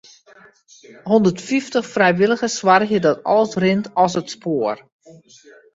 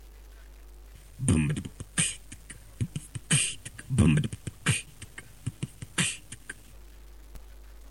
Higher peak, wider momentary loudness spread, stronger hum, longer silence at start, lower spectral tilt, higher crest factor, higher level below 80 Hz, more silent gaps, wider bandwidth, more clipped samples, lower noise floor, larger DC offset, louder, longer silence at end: first, 0 dBFS vs -10 dBFS; second, 9 LU vs 21 LU; neither; first, 1.05 s vs 0 s; about the same, -5 dB/octave vs -4 dB/octave; about the same, 18 dB vs 20 dB; second, -60 dBFS vs -46 dBFS; neither; second, 8 kHz vs 17 kHz; neither; about the same, -47 dBFS vs -49 dBFS; second, under 0.1% vs 0.2%; first, -18 LUFS vs -29 LUFS; first, 1 s vs 0 s